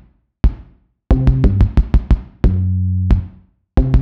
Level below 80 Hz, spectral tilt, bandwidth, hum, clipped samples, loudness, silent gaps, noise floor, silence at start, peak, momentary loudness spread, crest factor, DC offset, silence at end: -16 dBFS; -10 dB/octave; 5.2 kHz; none; under 0.1%; -17 LUFS; none; -45 dBFS; 0.45 s; -2 dBFS; 6 LU; 12 dB; 0.2%; 0 s